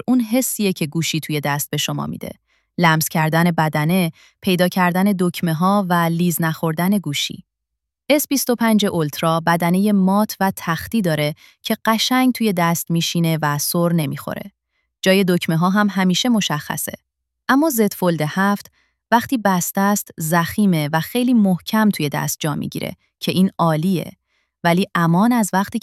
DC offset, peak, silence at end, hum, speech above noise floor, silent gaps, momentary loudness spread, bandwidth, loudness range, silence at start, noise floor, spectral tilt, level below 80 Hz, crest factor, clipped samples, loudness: under 0.1%; -2 dBFS; 0 s; none; 62 dB; none; 9 LU; 16 kHz; 2 LU; 0.1 s; -80 dBFS; -5 dB/octave; -58 dBFS; 18 dB; under 0.1%; -18 LUFS